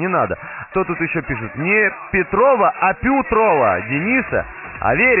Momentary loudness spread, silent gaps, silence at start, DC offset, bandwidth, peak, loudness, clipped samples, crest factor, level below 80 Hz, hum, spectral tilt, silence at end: 9 LU; none; 0 s; under 0.1%; 3.2 kHz; -2 dBFS; -17 LUFS; under 0.1%; 14 dB; -40 dBFS; none; -0.5 dB/octave; 0 s